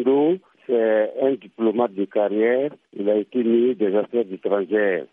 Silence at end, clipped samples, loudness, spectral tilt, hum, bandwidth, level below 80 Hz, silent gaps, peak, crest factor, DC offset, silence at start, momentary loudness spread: 0.1 s; under 0.1%; -21 LUFS; -9.5 dB/octave; none; 3.8 kHz; -76 dBFS; none; -6 dBFS; 14 dB; under 0.1%; 0 s; 5 LU